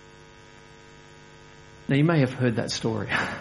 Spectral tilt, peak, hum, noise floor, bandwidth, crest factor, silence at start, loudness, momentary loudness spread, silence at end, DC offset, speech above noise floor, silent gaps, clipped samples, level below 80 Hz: -6 dB/octave; -6 dBFS; none; -49 dBFS; 11.5 kHz; 20 dB; 0.2 s; -24 LUFS; 6 LU; 0 s; under 0.1%; 25 dB; none; under 0.1%; -56 dBFS